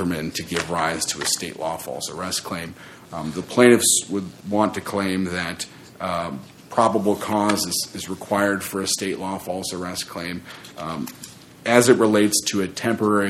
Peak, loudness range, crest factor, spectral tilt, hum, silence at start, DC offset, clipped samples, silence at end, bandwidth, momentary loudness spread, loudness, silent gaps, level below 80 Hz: 0 dBFS; 5 LU; 22 dB; -3.5 dB/octave; none; 0 s; under 0.1%; under 0.1%; 0 s; 16.5 kHz; 16 LU; -22 LUFS; none; -56 dBFS